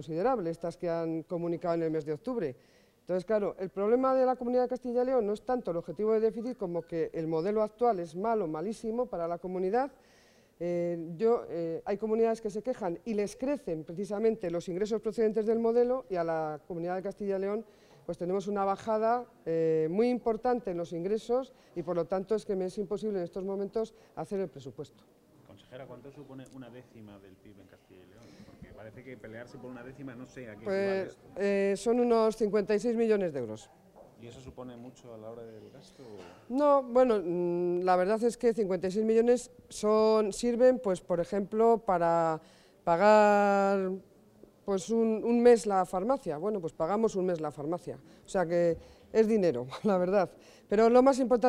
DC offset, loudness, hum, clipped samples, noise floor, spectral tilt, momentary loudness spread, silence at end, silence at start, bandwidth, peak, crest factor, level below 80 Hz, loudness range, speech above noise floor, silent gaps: under 0.1%; -30 LUFS; none; under 0.1%; -58 dBFS; -6.5 dB/octave; 20 LU; 0 s; 0 s; 12 kHz; -10 dBFS; 20 dB; -64 dBFS; 12 LU; 29 dB; none